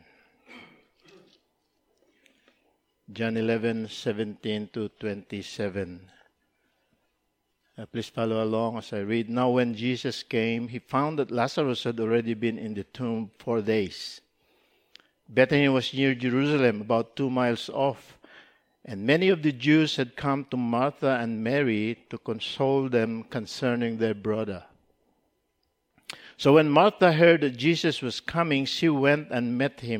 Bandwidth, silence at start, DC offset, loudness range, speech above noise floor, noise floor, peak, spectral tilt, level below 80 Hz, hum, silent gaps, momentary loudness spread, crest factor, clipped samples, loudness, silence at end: 14.5 kHz; 0.5 s; under 0.1%; 11 LU; 50 dB; -76 dBFS; -6 dBFS; -6 dB/octave; -68 dBFS; none; none; 14 LU; 22 dB; under 0.1%; -26 LUFS; 0 s